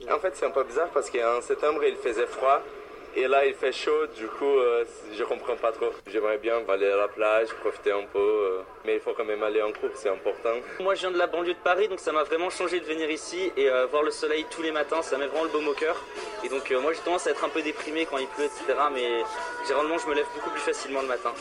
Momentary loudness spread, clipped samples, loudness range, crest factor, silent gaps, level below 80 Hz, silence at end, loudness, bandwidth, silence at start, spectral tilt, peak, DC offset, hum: 6 LU; under 0.1%; 2 LU; 18 dB; none; -62 dBFS; 0 s; -27 LUFS; 11.5 kHz; 0 s; -2.5 dB/octave; -8 dBFS; under 0.1%; none